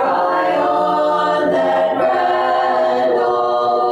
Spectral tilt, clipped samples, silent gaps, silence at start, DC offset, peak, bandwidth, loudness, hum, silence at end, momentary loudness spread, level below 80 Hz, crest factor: -5.5 dB/octave; under 0.1%; none; 0 s; under 0.1%; -6 dBFS; 10 kHz; -16 LUFS; none; 0 s; 1 LU; -60 dBFS; 8 dB